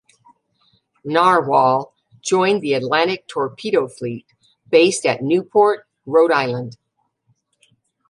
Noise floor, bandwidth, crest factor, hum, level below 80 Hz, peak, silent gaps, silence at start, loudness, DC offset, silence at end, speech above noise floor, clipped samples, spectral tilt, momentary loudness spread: -65 dBFS; 11.5 kHz; 18 dB; none; -68 dBFS; -2 dBFS; none; 1.05 s; -18 LUFS; under 0.1%; 1.35 s; 48 dB; under 0.1%; -4.5 dB/octave; 14 LU